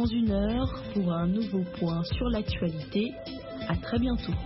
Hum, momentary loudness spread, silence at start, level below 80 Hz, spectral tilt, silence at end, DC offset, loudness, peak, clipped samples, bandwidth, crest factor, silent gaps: none; 6 LU; 0 s; -40 dBFS; -11 dB/octave; 0 s; under 0.1%; -30 LUFS; -16 dBFS; under 0.1%; 5.8 kHz; 12 dB; none